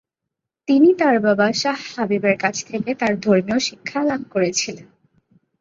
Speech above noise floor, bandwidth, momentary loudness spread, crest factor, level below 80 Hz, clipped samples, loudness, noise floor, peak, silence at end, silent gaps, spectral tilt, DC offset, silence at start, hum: 64 dB; 7.8 kHz; 10 LU; 18 dB; -62 dBFS; under 0.1%; -19 LUFS; -82 dBFS; -2 dBFS; 0.8 s; none; -4.5 dB/octave; under 0.1%; 0.7 s; none